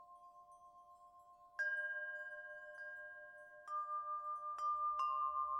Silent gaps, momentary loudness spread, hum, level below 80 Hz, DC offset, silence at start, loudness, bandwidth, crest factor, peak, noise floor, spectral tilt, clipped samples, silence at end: none; 24 LU; none; -84 dBFS; under 0.1%; 0 s; -43 LUFS; 11 kHz; 14 dB; -30 dBFS; -64 dBFS; -1 dB/octave; under 0.1%; 0 s